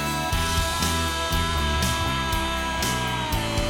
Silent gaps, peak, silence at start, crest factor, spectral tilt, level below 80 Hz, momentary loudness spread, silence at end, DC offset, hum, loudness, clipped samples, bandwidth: none; -10 dBFS; 0 s; 14 dB; -3.5 dB/octave; -32 dBFS; 2 LU; 0 s; 0.4%; none; -24 LUFS; under 0.1%; 17.5 kHz